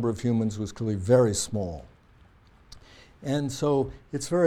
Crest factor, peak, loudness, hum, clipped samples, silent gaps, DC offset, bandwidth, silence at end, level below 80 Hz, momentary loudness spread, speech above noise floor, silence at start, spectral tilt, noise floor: 18 dB; -8 dBFS; -27 LUFS; none; under 0.1%; none; under 0.1%; 15 kHz; 0 s; -52 dBFS; 13 LU; 31 dB; 0 s; -6 dB/octave; -56 dBFS